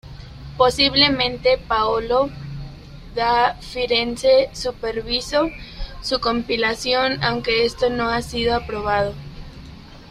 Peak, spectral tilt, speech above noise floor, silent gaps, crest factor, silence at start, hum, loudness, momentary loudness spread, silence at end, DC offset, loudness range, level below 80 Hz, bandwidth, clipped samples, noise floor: -2 dBFS; -4 dB/octave; 20 dB; none; 18 dB; 0.05 s; none; -19 LUFS; 19 LU; 0 s; under 0.1%; 2 LU; -38 dBFS; 14 kHz; under 0.1%; -40 dBFS